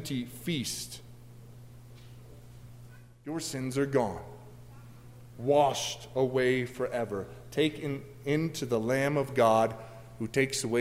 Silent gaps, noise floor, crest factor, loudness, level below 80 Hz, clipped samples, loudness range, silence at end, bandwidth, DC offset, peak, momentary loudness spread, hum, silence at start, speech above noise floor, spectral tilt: none; -51 dBFS; 20 dB; -30 LUFS; -60 dBFS; under 0.1%; 10 LU; 0 s; 16 kHz; under 0.1%; -10 dBFS; 25 LU; 60 Hz at -55 dBFS; 0 s; 21 dB; -5 dB/octave